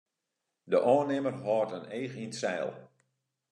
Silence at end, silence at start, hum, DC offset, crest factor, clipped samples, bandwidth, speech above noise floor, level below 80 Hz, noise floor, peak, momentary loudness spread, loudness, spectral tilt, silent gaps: 0.65 s; 0.65 s; none; under 0.1%; 20 dB; under 0.1%; 10.5 kHz; 55 dB; -86 dBFS; -85 dBFS; -12 dBFS; 12 LU; -31 LUFS; -5.5 dB/octave; none